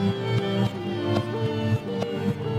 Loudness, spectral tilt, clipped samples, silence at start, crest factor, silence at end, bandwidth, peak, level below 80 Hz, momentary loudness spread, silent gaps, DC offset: -26 LUFS; -7.5 dB/octave; under 0.1%; 0 s; 16 dB; 0 s; 13 kHz; -10 dBFS; -58 dBFS; 3 LU; none; under 0.1%